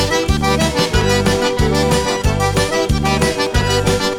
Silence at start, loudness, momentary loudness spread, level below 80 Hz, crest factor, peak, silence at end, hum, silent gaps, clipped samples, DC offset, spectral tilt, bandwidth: 0 s; -15 LUFS; 2 LU; -24 dBFS; 12 dB; -4 dBFS; 0 s; none; none; under 0.1%; under 0.1%; -4.5 dB/octave; 18 kHz